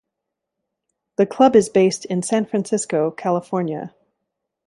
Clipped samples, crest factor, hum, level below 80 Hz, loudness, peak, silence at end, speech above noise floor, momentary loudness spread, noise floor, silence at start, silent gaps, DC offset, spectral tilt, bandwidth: under 0.1%; 18 dB; none; -64 dBFS; -19 LUFS; -2 dBFS; 0.8 s; 63 dB; 13 LU; -81 dBFS; 1.2 s; none; under 0.1%; -5.5 dB/octave; 11.5 kHz